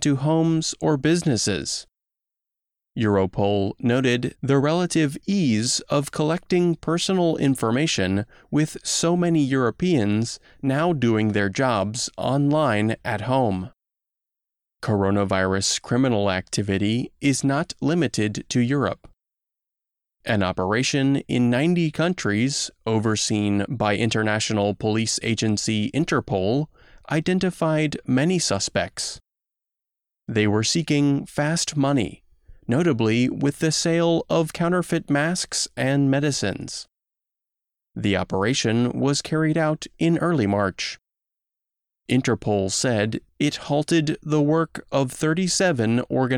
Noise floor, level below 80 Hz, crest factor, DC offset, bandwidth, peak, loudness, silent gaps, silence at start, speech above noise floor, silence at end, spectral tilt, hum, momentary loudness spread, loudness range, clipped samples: -87 dBFS; -54 dBFS; 14 dB; under 0.1%; 15.5 kHz; -8 dBFS; -22 LUFS; none; 0 s; 66 dB; 0 s; -5 dB/octave; none; 6 LU; 3 LU; under 0.1%